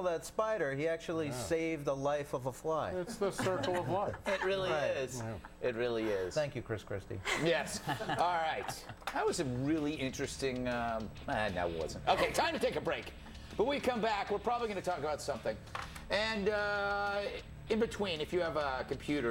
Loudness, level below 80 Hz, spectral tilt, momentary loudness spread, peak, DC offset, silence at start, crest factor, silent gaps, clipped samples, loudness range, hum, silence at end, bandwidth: -35 LUFS; -56 dBFS; -4.5 dB/octave; 7 LU; -16 dBFS; under 0.1%; 0 s; 20 dB; none; under 0.1%; 2 LU; none; 0 s; 17 kHz